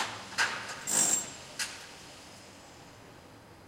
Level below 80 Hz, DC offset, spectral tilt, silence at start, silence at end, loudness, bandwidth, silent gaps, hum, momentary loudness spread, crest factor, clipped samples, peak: -68 dBFS; under 0.1%; 0 dB/octave; 0 s; 0 s; -30 LUFS; 16 kHz; none; none; 25 LU; 22 dB; under 0.1%; -14 dBFS